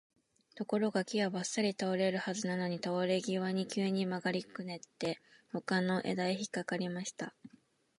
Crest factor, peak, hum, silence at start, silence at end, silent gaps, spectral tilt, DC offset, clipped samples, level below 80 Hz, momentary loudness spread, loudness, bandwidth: 16 dB; -18 dBFS; none; 0.55 s; 0.5 s; none; -5 dB/octave; under 0.1%; under 0.1%; -82 dBFS; 11 LU; -35 LUFS; 11.5 kHz